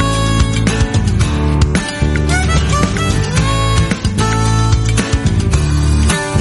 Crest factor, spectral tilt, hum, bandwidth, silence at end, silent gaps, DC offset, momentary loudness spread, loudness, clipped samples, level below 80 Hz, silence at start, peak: 12 dB; -5 dB/octave; none; 11.5 kHz; 0 s; none; under 0.1%; 2 LU; -14 LUFS; under 0.1%; -18 dBFS; 0 s; 0 dBFS